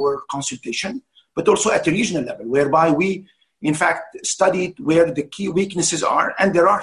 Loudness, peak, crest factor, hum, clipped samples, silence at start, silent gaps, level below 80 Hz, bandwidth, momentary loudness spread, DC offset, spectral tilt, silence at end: -19 LUFS; -4 dBFS; 16 dB; none; under 0.1%; 0 s; none; -56 dBFS; 12 kHz; 9 LU; under 0.1%; -4 dB/octave; 0 s